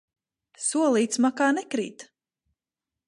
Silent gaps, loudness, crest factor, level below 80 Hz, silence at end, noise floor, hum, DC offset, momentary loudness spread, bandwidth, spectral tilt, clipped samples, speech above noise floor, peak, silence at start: none; -24 LUFS; 16 dB; -80 dBFS; 1.05 s; -89 dBFS; none; under 0.1%; 9 LU; 11.5 kHz; -3 dB/octave; under 0.1%; 65 dB; -10 dBFS; 0.6 s